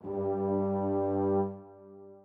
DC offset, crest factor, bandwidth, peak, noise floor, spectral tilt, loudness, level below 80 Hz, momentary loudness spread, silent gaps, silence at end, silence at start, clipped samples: under 0.1%; 12 dB; 2.9 kHz; -18 dBFS; -51 dBFS; -12.5 dB/octave; -31 LUFS; -74 dBFS; 22 LU; none; 0.05 s; 0.05 s; under 0.1%